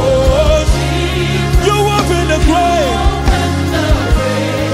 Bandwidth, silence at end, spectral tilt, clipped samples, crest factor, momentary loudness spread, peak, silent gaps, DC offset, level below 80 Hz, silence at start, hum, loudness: 15.5 kHz; 0 s; -5.5 dB/octave; under 0.1%; 12 dB; 3 LU; 0 dBFS; none; under 0.1%; -16 dBFS; 0 s; none; -13 LUFS